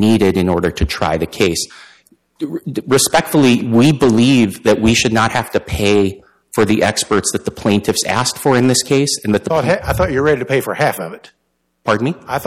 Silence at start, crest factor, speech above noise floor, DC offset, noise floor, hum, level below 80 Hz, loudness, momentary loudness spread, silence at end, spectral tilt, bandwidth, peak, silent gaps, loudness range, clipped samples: 0 s; 12 dB; 42 dB; under 0.1%; -56 dBFS; none; -36 dBFS; -15 LUFS; 8 LU; 0 s; -4.5 dB/octave; 16 kHz; -2 dBFS; none; 4 LU; under 0.1%